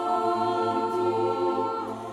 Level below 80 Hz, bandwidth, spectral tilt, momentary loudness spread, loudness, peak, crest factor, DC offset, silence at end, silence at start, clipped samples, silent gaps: -66 dBFS; 12 kHz; -6.5 dB/octave; 3 LU; -26 LUFS; -14 dBFS; 12 dB; under 0.1%; 0 s; 0 s; under 0.1%; none